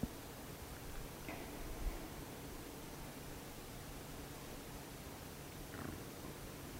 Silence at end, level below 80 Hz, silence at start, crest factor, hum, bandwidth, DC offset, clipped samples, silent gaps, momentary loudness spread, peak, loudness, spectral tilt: 0 s; -54 dBFS; 0 s; 22 dB; none; 16 kHz; under 0.1%; under 0.1%; none; 3 LU; -26 dBFS; -50 LUFS; -4.5 dB/octave